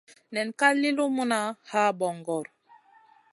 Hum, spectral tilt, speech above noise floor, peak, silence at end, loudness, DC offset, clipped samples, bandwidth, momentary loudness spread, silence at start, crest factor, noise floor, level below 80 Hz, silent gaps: none; -4 dB/octave; 33 dB; -6 dBFS; 0.9 s; -26 LUFS; under 0.1%; under 0.1%; 11.5 kHz; 11 LU; 0.3 s; 22 dB; -59 dBFS; -82 dBFS; none